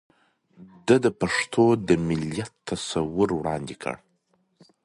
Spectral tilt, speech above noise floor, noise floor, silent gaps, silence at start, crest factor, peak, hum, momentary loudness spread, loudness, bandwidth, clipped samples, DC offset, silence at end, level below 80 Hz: -5.5 dB/octave; 45 dB; -69 dBFS; none; 0.6 s; 20 dB; -4 dBFS; none; 13 LU; -25 LUFS; 11.5 kHz; under 0.1%; under 0.1%; 0.9 s; -52 dBFS